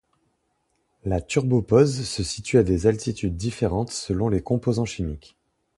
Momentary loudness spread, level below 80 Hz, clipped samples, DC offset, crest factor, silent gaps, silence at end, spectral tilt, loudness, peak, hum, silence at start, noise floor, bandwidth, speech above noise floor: 9 LU; -40 dBFS; under 0.1%; under 0.1%; 20 dB; none; 0.6 s; -6 dB/octave; -23 LUFS; -4 dBFS; none; 1.05 s; -71 dBFS; 11.5 kHz; 49 dB